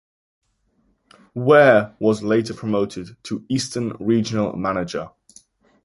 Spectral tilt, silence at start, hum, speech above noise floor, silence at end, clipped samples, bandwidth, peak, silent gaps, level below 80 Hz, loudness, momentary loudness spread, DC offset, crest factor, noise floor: -6 dB/octave; 1.35 s; none; 46 dB; 0.75 s; under 0.1%; 11.5 kHz; -2 dBFS; none; -56 dBFS; -20 LUFS; 18 LU; under 0.1%; 20 dB; -65 dBFS